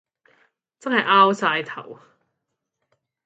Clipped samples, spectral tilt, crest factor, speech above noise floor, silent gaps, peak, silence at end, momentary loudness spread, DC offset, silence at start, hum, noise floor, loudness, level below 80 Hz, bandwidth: under 0.1%; -4.5 dB/octave; 22 dB; 60 dB; none; -2 dBFS; 1.3 s; 19 LU; under 0.1%; 0.85 s; none; -80 dBFS; -18 LUFS; -78 dBFS; 8.4 kHz